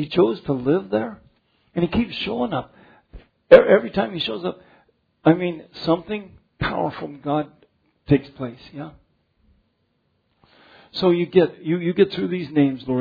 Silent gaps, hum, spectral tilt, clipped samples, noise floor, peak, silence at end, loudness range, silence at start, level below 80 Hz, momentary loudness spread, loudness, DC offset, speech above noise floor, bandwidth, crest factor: none; none; -9 dB/octave; under 0.1%; -68 dBFS; 0 dBFS; 0 s; 9 LU; 0 s; -50 dBFS; 15 LU; -21 LUFS; under 0.1%; 48 dB; 5.4 kHz; 22 dB